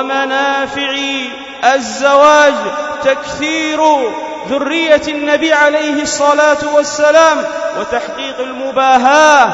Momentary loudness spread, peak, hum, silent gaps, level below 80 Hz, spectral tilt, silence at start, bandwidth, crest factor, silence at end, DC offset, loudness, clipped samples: 12 LU; 0 dBFS; none; none; -50 dBFS; -2 dB/octave; 0 s; 8 kHz; 12 dB; 0 s; under 0.1%; -12 LUFS; 0.2%